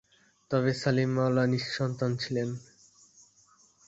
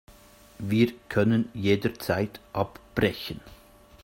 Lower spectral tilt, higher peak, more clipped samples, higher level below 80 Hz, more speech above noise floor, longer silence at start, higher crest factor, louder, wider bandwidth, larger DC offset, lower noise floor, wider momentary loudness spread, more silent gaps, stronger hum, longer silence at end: about the same, -6.5 dB/octave vs -7 dB/octave; second, -12 dBFS vs -8 dBFS; neither; second, -64 dBFS vs -54 dBFS; first, 35 dB vs 27 dB; about the same, 0.5 s vs 0.6 s; about the same, 18 dB vs 20 dB; about the same, -29 LUFS vs -27 LUFS; second, 8 kHz vs 16.5 kHz; neither; first, -63 dBFS vs -53 dBFS; second, 6 LU vs 12 LU; neither; neither; first, 1.3 s vs 0.5 s